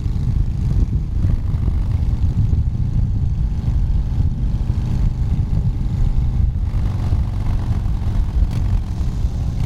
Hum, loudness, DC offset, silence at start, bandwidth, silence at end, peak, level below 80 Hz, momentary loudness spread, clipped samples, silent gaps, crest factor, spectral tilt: none; -21 LUFS; under 0.1%; 0 s; 7.4 kHz; 0 s; -6 dBFS; -20 dBFS; 2 LU; under 0.1%; none; 12 dB; -9 dB/octave